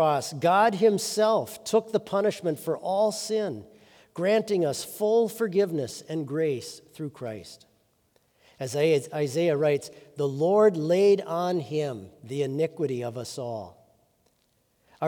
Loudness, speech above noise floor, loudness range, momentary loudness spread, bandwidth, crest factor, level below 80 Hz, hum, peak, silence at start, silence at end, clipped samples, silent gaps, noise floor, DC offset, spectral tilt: -26 LUFS; 44 dB; 7 LU; 16 LU; 19.5 kHz; 16 dB; -76 dBFS; none; -10 dBFS; 0 s; 0 s; under 0.1%; none; -69 dBFS; under 0.1%; -5.5 dB/octave